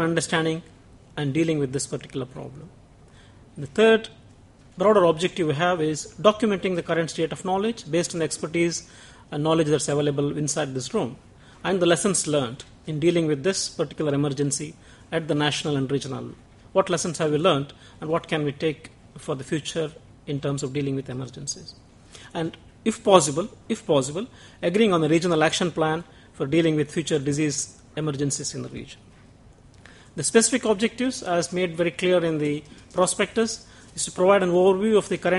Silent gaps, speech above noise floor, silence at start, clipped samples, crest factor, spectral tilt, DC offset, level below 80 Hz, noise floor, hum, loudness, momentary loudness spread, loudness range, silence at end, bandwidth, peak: none; 27 dB; 0 s; under 0.1%; 24 dB; -4.5 dB/octave; under 0.1%; -56 dBFS; -51 dBFS; none; -24 LUFS; 14 LU; 6 LU; 0 s; 11.5 kHz; 0 dBFS